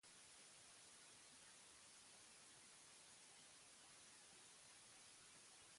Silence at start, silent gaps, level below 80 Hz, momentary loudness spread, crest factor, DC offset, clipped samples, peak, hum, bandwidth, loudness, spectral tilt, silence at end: 0.05 s; none; under -90 dBFS; 0 LU; 14 dB; under 0.1%; under 0.1%; -52 dBFS; none; 11.5 kHz; -63 LUFS; 0 dB/octave; 0 s